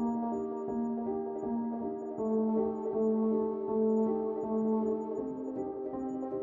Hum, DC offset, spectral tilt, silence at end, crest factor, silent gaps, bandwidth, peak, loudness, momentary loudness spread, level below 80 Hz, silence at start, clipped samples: none; under 0.1%; -11 dB/octave; 0 s; 14 dB; none; 7.2 kHz; -20 dBFS; -33 LUFS; 8 LU; -66 dBFS; 0 s; under 0.1%